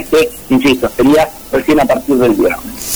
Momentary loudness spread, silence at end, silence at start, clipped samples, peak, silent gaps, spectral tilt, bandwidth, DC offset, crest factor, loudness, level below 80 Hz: 5 LU; 0 s; 0 s; under 0.1%; -2 dBFS; none; -4.5 dB/octave; over 20 kHz; 0.8%; 8 dB; -12 LUFS; -36 dBFS